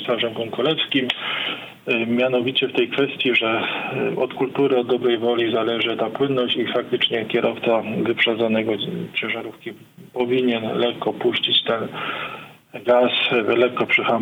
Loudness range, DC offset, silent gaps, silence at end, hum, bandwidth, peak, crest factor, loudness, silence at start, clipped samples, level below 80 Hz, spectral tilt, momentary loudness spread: 2 LU; under 0.1%; none; 0 s; none; 16.5 kHz; -4 dBFS; 16 dB; -20 LUFS; 0 s; under 0.1%; -68 dBFS; -6 dB/octave; 9 LU